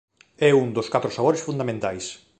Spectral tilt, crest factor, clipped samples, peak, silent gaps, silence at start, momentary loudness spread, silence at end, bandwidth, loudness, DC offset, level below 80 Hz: -5.5 dB/octave; 18 dB; under 0.1%; -4 dBFS; none; 0.4 s; 9 LU; 0.25 s; 9 kHz; -22 LUFS; under 0.1%; -60 dBFS